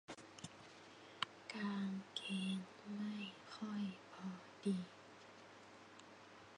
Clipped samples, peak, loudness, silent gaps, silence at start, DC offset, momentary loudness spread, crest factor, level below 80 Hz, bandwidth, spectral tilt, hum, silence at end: under 0.1%; -20 dBFS; -47 LUFS; none; 0.1 s; under 0.1%; 16 LU; 28 dB; -86 dBFS; 10.5 kHz; -5 dB/octave; none; 0 s